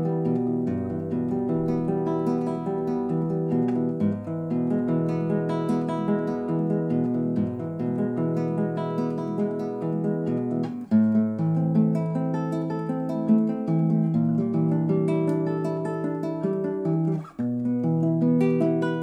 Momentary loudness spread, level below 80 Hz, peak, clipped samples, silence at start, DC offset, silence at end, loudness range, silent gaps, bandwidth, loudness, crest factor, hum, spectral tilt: 6 LU; -60 dBFS; -10 dBFS; under 0.1%; 0 s; under 0.1%; 0 s; 2 LU; none; 5.8 kHz; -25 LUFS; 14 dB; none; -10 dB/octave